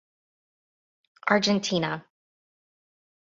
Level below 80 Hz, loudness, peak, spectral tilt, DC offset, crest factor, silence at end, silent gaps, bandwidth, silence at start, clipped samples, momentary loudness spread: -68 dBFS; -25 LUFS; -6 dBFS; -4 dB/octave; under 0.1%; 24 dB; 1.25 s; none; 7.8 kHz; 1.25 s; under 0.1%; 11 LU